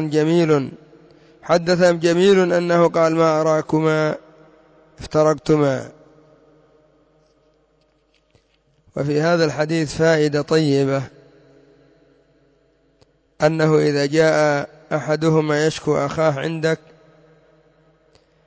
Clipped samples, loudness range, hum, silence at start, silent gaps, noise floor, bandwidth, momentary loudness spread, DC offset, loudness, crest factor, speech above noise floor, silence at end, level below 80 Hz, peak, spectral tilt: under 0.1%; 7 LU; none; 0 s; none; -62 dBFS; 8 kHz; 10 LU; under 0.1%; -18 LUFS; 14 dB; 44 dB; 1.7 s; -54 dBFS; -4 dBFS; -6 dB/octave